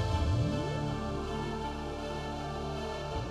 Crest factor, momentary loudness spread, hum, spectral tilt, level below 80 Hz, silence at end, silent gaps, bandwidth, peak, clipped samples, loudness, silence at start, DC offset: 14 dB; 7 LU; none; -6.5 dB/octave; -42 dBFS; 0 s; none; 12.5 kHz; -20 dBFS; under 0.1%; -35 LUFS; 0 s; under 0.1%